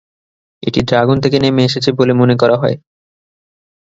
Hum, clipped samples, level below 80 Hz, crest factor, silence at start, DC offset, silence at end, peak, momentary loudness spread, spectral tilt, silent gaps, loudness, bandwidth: none; under 0.1%; -44 dBFS; 14 dB; 0.65 s; under 0.1%; 1.2 s; 0 dBFS; 8 LU; -6.5 dB/octave; none; -13 LUFS; 7.8 kHz